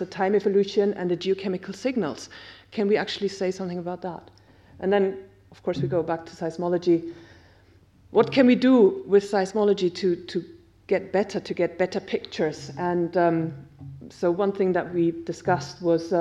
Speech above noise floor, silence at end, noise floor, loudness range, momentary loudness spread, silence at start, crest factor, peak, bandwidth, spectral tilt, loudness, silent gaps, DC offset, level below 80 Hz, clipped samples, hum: 32 dB; 0 s; -56 dBFS; 6 LU; 14 LU; 0 s; 20 dB; -6 dBFS; 11 kHz; -6.5 dB/octave; -24 LUFS; none; under 0.1%; -62 dBFS; under 0.1%; none